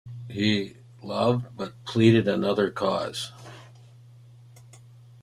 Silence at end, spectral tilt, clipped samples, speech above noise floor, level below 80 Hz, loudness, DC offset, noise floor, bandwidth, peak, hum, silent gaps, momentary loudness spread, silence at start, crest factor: 0.45 s; -6.5 dB/octave; under 0.1%; 26 dB; -62 dBFS; -25 LUFS; under 0.1%; -50 dBFS; 13 kHz; -6 dBFS; none; none; 19 LU; 0.05 s; 22 dB